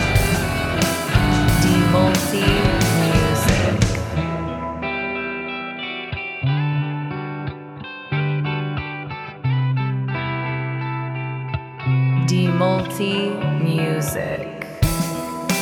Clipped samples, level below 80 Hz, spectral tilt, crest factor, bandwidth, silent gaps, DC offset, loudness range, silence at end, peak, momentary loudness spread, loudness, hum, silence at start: under 0.1%; -32 dBFS; -5.5 dB/octave; 18 dB; over 20 kHz; none; under 0.1%; 7 LU; 0 s; -2 dBFS; 10 LU; -21 LUFS; none; 0 s